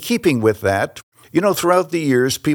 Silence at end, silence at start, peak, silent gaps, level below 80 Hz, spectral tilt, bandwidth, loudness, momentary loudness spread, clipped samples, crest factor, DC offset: 0 s; 0 s; -2 dBFS; 1.03-1.12 s; -56 dBFS; -5 dB/octave; over 20 kHz; -17 LUFS; 6 LU; under 0.1%; 16 dB; under 0.1%